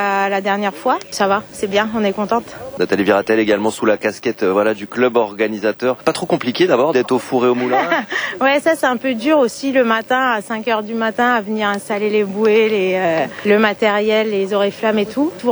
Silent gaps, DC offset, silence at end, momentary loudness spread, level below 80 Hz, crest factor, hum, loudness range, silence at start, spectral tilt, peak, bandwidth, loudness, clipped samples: none; under 0.1%; 0 s; 5 LU; -58 dBFS; 16 dB; none; 2 LU; 0 s; -5 dB/octave; 0 dBFS; over 20 kHz; -16 LUFS; under 0.1%